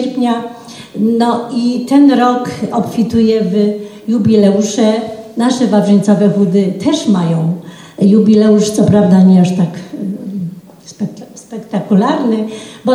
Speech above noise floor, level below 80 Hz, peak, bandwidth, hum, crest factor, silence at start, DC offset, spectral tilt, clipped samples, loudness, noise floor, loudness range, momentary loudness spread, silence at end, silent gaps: 23 dB; -52 dBFS; 0 dBFS; 12 kHz; none; 12 dB; 0 s; under 0.1%; -7 dB/octave; under 0.1%; -12 LUFS; -34 dBFS; 3 LU; 15 LU; 0 s; none